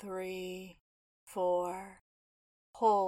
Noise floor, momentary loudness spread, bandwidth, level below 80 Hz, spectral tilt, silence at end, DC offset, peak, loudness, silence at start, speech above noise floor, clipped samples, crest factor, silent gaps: under -90 dBFS; 17 LU; 16 kHz; -72 dBFS; -5.5 dB/octave; 0 s; under 0.1%; -16 dBFS; -36 LUFS; 0 s; over 57 dB; under 0.1%; 20 dB; 0.81-1.27 s, 2.01-2.73 s